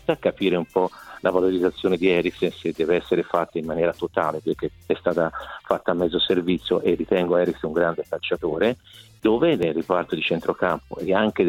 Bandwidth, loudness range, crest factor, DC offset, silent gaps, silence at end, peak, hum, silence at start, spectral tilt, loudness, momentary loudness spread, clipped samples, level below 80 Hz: 15.5 kHz; 2 LU; 18 dB; under 0.1%; none; 0 s; -4 dBFS; none; 0.1 s; -7 dB/octave; -23 LUFS; 7 LU; under 0.1%; -52 dBFS